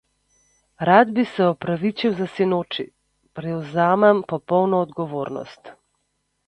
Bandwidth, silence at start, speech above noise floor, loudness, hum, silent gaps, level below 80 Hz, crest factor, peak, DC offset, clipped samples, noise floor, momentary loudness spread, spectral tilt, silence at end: 9 kHz; 0.8 s; 52 dB; -20 LUFS; 50 Hz at -60 dBFS; none; -62 dBFS; 22 dB; 0 dBFS; under 0.1%; under 0.1%; -72 dBFS; 15 LU; -7.5 dB/octave; 0.75 s